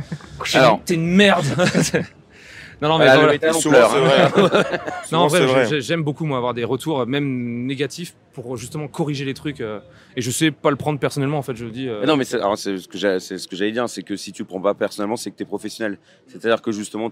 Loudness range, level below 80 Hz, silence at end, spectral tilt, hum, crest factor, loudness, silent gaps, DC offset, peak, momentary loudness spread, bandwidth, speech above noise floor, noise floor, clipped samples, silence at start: 10 LU; -56 dBFS; 0 s; -5 dB/octave; none; 20 dB; -19 LUFS; none; under 0.1%; 0 dBFS; 16 LU; 16 kHz; 23 dB; -42 dBFS; under 0.1%; 0 s